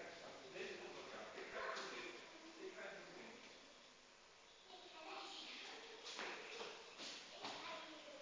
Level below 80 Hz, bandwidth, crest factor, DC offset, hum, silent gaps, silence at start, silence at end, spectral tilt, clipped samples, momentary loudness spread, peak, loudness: -88 dBFS; 8 kHz; 22 dB; under 0.1%; none; none; 0 s; 0 s; -1.5 dB/octave; under 0.1%; 12 LU; -32 dBFS; -52 LUFS